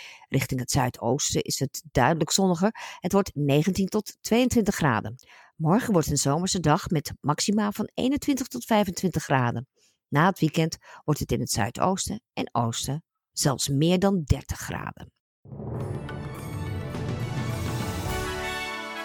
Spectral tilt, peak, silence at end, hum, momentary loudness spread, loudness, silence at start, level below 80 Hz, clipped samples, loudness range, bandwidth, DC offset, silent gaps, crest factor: -5 dB/octave; -6 dBFS; 0 s; none; 11 LU; -26 LUFS; 0 s; -46 dBFS; under 0.1%; 7 LU; 19 kHz; under 0.1%; 15.20-15.43 s; 20 dB